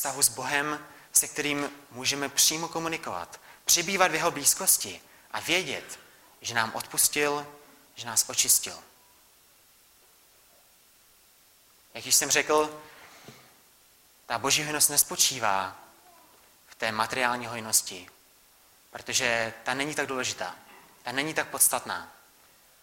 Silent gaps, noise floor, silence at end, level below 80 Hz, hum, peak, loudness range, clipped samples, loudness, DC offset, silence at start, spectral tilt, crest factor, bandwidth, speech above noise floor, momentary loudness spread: none; -60 dBFS; 0.7 s; -66 dBFS; none; -6 dBFS; 5 LU; under 0.1%; -25 LUFS; under 0.1%; 0 s; -0.5 dB/octave; 24 dB; 16.5 kHz; 32 dB; 16 LU